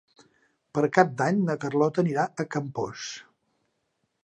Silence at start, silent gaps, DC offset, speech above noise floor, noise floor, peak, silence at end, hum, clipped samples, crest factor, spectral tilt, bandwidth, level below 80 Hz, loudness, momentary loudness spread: 0.75 s; none; under 0.1%; 51 dB; -76 dBFS; -2 dBFS; 1 s; none; under 0.1%; 24 dB; -6.5 dB/octave; 10 kHz; -70 dBFS; -26 LUFS; 12 LU